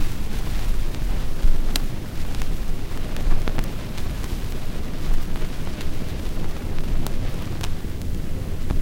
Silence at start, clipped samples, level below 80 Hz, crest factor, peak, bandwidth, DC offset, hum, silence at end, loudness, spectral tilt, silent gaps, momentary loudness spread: 0 s; under 0.1%; -22 dBFS; 18 dB; 0 dBFS; 16 kHz; under 0.1%; none; 0 s; -30 LUFS; -5.5 dB/octave; none; 5 LU